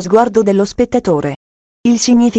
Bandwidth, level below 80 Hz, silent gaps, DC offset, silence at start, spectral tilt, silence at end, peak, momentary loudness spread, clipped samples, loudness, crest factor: 8.6 kHz; -42 dBFS; 1.36-1.84 s; under 0.1%; 0 s; -5 dB/octave; 0 s; 0 dBFS; 9 LU; under 0.1%; -13 LUFS; 12 dB